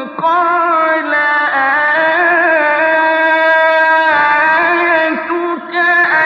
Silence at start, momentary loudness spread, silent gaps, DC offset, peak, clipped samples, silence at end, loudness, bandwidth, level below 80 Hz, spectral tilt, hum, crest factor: 0 s; 5 LU; none; under 0.1%; -2 dBFS; under 0.1%; 0 s; -11 LUFS; 7 kHz; -64 dBFS; -5 dB/octave; none; 10 dB